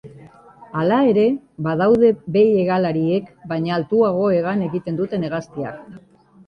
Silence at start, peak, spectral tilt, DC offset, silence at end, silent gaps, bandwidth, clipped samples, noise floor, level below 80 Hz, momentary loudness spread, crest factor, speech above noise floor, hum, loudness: 0.05 s; -4 dBFS; -9 dB/octave; under 0.1%; 0.5 s; none; 6.4 kHz; under 0.1%; -44 dBFS; -56 dBFS; 12 LU; 16 dB; 26 dB; none; -19 LUFS